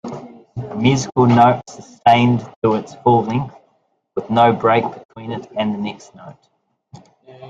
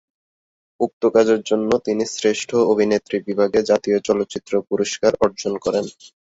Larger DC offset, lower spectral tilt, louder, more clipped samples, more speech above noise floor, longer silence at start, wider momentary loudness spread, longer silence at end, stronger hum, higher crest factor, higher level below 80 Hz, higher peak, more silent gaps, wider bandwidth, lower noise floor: neither; first, -6.5 dB/octave vs -4.5 dB/octave; first, -16 LUFS vs -19 LUFS; neither; second, 47 dB vs over 71 dB; second, 0.05 s vs 0.8 s; first, 19 LU vs 7 LU; second, 0 s vs 0.3 s; neither; about the same, 18 dB vs 16 dB; about the same, -54 dBFS vs -56 dBFS; about the same, 0 dBFS vs -2 dBFS; about the same, 2.56-2.62 s, 5.05-5.09 s vs 0.93-1.01 s; about the same, 7.8 kHz vs 8 kHz; second, -64 dBFS vs under -90 dBFS